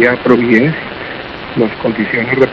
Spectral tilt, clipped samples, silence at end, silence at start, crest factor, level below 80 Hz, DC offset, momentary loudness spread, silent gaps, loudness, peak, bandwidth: -8 dB/octave; 0.5%; 0 s; 0 s; 12 dB; -44 dBFS; under 0.1%; 14 LU; none; -13 LUFS; 0 dBFS; 7 kHz